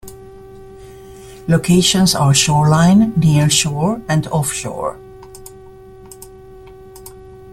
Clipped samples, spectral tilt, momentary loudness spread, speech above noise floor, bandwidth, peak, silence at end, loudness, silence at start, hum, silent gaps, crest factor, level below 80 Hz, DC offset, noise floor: under 0.1%; -4.5 dB/octave; 25 LU; 25 dB; 15.5 kHz; 0 dBFS; 0 s; -14 LUFS; 0.05 s; none; none; 16 dB; -42 dBFS; under 0.1%; -38 dBFS